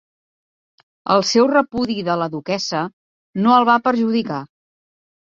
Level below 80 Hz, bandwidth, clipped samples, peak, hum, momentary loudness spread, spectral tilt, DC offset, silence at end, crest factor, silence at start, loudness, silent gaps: -60 dBFS; 7.6 kHz; under 0.1%; -2 dBFS; none; 14 LU; -5 dB/octave; under 0.1%; 0.75 s; 18 dB; 1.05 s; -18 LUFS; 2.93-3.33 s